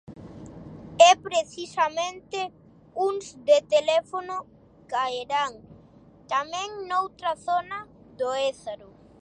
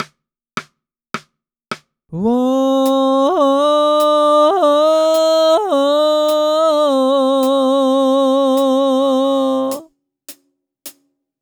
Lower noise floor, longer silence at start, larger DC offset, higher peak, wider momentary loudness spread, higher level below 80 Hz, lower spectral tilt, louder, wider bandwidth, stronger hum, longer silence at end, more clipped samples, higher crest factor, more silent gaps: second, -53 dBFS vs -64 dBFS; about the same, 0.1 s vs 0 s; neither; about the same, -2 dBFS vs -2 dBFS; first, 20 LU vs 17 LU; about the same, -62 dBFS vs -64 dBFS; second, -2 dB/octave vs -4.5 dB/octave; second, -25 LUFS vs -14 LUFS; second, 10 kHz vs over 20 kHz; neither; about the same, 0.45 s vs 0.5 s; neither; first, 24 dB vs 12 dB; neither